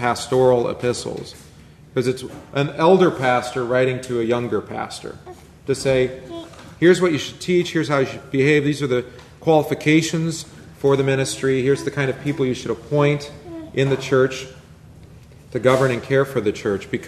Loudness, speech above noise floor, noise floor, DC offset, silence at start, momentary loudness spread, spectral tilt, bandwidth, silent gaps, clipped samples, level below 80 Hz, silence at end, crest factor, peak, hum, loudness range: -20 LUFS; 24 dB; -44 dBFS; under 0.1%; 0 s; 15 LU; -5.5 dB/octave; 13.5 kHz; none; under 0.1%; -52 dBFS; 0 s; 18 dB; -2 dBFS; none; 3 LU